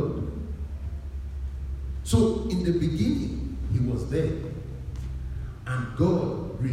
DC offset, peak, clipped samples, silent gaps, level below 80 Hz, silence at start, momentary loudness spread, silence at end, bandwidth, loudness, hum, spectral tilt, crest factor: under 0.1%; -8 dBFS; under 0.1%; none; -36 dBFS; 0 s; 12 LU; 0 s; 14.5 kHz; -29 LUFS; none; -7.5 dB/octave; 20 dB